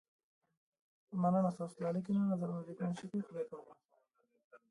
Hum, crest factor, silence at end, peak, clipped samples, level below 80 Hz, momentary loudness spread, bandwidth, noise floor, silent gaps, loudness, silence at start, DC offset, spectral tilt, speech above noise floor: none; 18 dB; 0.15 s; -22 dBFS; under 0.1%; -82 dBFS; 12 LU; 11 kHz; -78 dBFS; 3.85-3.89 s, 4.44-4.51 s; -38 LUFS; 1.1 s; under 0.1%; -9 dB/octave; 41 dB